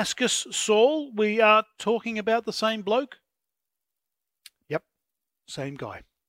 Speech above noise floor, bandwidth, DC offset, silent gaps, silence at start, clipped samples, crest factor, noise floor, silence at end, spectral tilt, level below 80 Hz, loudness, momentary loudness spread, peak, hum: 62 dB; 16 kHz; under 0.1%; none; 0 s; under 0.1%; 20 dB; -87 dBFS; 0.3 s; -3 dB/octave; -68 dBFS; -24 LUFS; 16 LU; -6 dBFS; none